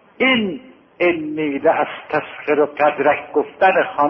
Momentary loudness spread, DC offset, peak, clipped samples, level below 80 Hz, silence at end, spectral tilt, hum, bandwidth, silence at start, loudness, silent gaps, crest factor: 7 LU; under 0.1%; -2 dBFS; under 0.1%; -60 dBFS; 0 s; -8 dB/octave; none; 5.8 kHz; 0.2 s; -18 LUFS; none; 16 dB